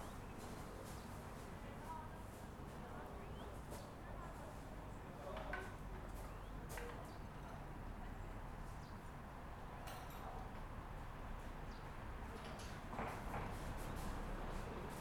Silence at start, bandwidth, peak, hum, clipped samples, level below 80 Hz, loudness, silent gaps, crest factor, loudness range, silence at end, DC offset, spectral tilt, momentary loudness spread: 0 s; 19 kHz; -32 dBFS; none; under 0.1%; -54 dBFS; -52 LUFS; none; 18 dB; 3 LU; 0 s; under 0.1%; -5.5 dB/octave; 6 LU